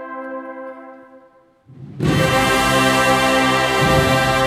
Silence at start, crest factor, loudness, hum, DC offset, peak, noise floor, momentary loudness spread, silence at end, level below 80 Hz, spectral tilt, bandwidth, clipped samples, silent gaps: 0 s; 16 dB; -15 LUFS; none; under 0.1%; -2 dBFS; -51 dBFS; 16 LU; 0 s; -38 dBFS; -4.5 dB/octave; 16.5 kHz; under 0.1%; none